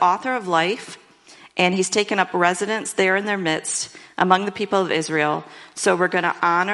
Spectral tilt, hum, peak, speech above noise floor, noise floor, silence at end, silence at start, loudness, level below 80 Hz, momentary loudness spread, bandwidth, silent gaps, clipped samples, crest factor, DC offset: -3.5 dB/octave; none; 0 dBFS; 27 dB; -48 dBFS; 0 s; 0 s; -21 LUFS; -68 dBFS; 7 LU; 11.5 kHz; none; under 0.1%; 22 dB; under 0.1%